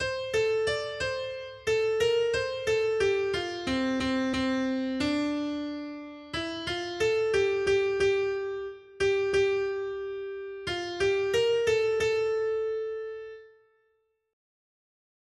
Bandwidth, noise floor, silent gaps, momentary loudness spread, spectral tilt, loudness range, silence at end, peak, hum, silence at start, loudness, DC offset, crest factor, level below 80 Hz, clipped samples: 12.5 kHz; -73 dBFS; none; 11 LU; -4.5 dB/octave; 3 LU; 1.85 s; -14 dBFS; none; 0 s; -28 LUFS; under 0.1%; 14 dB; -56 dBFS; under 0.1%